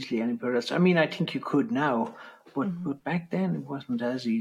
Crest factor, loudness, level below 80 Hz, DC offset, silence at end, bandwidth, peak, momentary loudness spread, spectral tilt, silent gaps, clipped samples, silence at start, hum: 16 dB; -28 LUFS; -76 dBFS; under 0.1%; 0 s; 11.5 kHz; -10 dBFS; 10 LU; -7 dB/octave; none; under 0.1%; 0 s; none